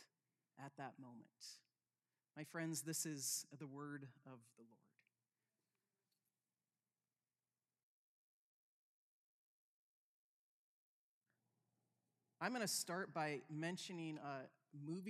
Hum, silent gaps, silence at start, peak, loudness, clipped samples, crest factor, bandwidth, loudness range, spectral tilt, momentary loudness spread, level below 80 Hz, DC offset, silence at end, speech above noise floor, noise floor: none; 7.83-11.21 s; 0 s; -28 dBFS; -47 LUFS; under 0.1%; 26 dB; 15 kHz; 11 LU; -3 dB/octave; 18 LU; under -90 dBFS; under 0.1%; 0 s; over 41 dB; under -90 dBFS